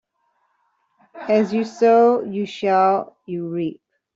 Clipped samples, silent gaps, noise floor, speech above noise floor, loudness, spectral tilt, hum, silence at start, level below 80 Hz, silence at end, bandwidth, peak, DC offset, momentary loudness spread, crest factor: under 0.1%; none; -68 dBFS; 50 dB; -19 LUFS; -7 dB/octave; none; 1.15 s; -70 dBFS; 0.45 s; 7.6 kHz; -4 dBFS; under 0.1%; 15 LU; 16 dB